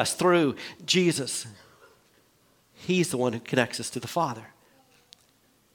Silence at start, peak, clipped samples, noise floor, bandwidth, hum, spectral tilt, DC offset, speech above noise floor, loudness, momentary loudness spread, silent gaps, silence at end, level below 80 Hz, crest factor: 0 s; -6 dBFS; under 0.1%; -64 dBFS; 18 kHz; none; -4 dB/octave; under 0.1%; 38 dB; -26 LUFS; 14 LU; none; 1.3 s; -70 dBFS; 22 dB